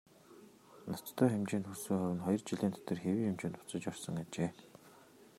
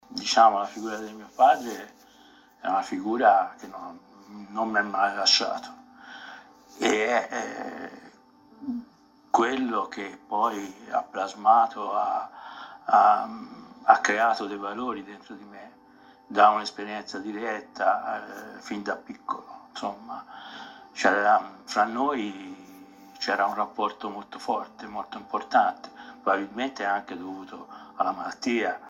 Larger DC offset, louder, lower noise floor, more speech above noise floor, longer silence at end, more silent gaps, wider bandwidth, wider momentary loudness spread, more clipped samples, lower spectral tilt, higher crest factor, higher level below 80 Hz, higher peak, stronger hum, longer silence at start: neither; second, -37 LUFS vs -26 LUFS; first, -61 dBFS vs -55 dBFS; second, 24 dB vs 29 dB; about the same, 0.1 s vs 0 s; neither; about the same, 16 kHz vs 15 kHz; second, 11 LU vs 21 LU; neither; first, -6.5 dB/octave vs -2.5 dB/octave; about the same, 22 dB vs 24 dB; about the same, -76 dBFS vs -72 dBFS; second, -16 dBFS vs -2 dBFS; neither; first, 0.3 s vs 0.1 s